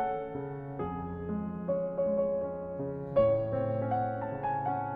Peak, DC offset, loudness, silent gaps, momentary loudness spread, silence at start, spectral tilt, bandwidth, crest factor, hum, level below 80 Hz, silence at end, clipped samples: -16 dBFS; under 0.1%; -33 LUFS; none; 10 LU; 0 s; -11 dB/octave; 4 kHz; 16 dB; none; -56 dBFS; 0 s; under 0.1%